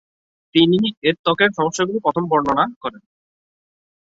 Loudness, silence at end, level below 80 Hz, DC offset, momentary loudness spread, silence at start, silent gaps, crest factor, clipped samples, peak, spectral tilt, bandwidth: -18 LUFS; 1.15 s; -58 dBFS; under 0.1%; 6 LU; 0.55 s; 0.97-1.02 s, 1.19-1.24 s, 2.76-2.81 s; 18 dB; under 0.1%; -2 dBFS; -5 dB/octave; 8 kHz